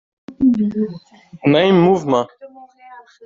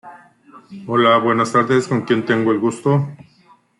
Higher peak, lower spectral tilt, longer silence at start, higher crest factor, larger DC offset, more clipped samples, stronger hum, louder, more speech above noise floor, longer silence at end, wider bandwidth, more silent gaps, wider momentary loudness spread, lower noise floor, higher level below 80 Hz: about the same, -2 dBFS vs -4 dBFS; about the same, -5.5 dB/octave vs -6 dB/octave; first, 0.3 s vs 0.05 s; about the same, 14 dB vs 14 dB; neither; neither; neither; about the same, -16 LUFS vs -17 LUFS; second, 27 dB vs 36 dB; second, 0.25 s vs 0.65 s; second, 7.6 kHz vs 11.5 kHz; neither; first, 13 LU vs 7 LU; second, -42 dBFS vs -53 dBFS; first, -54 dBFS vs -62 dBFS